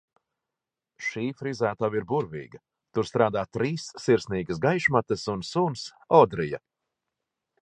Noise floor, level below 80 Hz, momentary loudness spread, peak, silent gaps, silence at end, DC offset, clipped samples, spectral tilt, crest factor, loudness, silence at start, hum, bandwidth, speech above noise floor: -88 dBFS; -58 dBFS; 12 LU; -4 dBFS; none; 1.05 s; under 0.1%; under 0.1%; -6 dB/octave; 24 dB; -26 LUFS; 1 s; none; 9.8 kHz; 63 dB